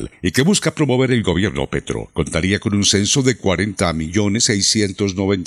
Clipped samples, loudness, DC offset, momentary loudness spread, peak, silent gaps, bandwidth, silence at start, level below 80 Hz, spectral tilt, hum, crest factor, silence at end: under 0.1%; -17 LUFS; under 0.1%; 7 LU; 0 dBFS; none; 14.5 kHz; 0 s; -42 dBFS; -4 dB/octave; none; 18 dB; 0 s